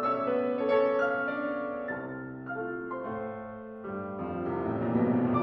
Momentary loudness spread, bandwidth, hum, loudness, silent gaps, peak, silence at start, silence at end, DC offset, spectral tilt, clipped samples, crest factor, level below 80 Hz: 13 LU; 6.2 kHz; none; -31 LUFS; none; -14 dBFS; 0 s; 0 s; under 0.1%; -9 dB/octave; under 0.1%; 16 dB; -64 dBFS